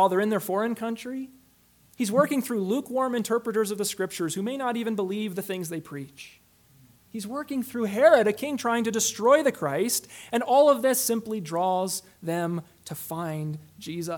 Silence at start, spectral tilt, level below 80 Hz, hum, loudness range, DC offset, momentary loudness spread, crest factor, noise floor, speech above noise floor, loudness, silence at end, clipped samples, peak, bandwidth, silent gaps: 0 s; -4 dB/octave; -72 dBFS; 60 Hz at -60 dBFS; 8 LU; under 0.1%; 16 LU; 20 dB; -60 dBFS; 35 dB; -26 LUFS; 0 s; under 0.1%; -6 dBFS; 19 kHz; none